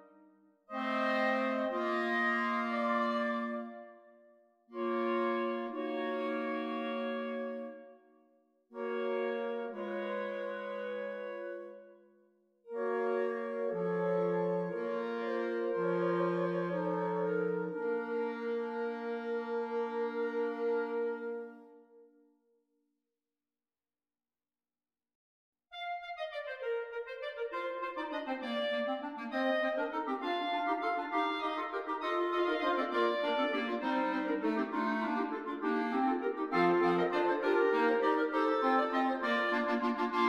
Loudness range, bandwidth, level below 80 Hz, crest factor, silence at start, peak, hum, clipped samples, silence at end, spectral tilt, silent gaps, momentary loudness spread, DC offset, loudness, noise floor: 10 LU; 9.4 kHz; -80 dBFS; 16 dB; 0 s; -18 dBFS; none; under 0.1%; 0 s; -6.5 dB/octave; 25.15-25.53 s; 10 LU; under 0.1%; -34 LUFS; under -90 dBFS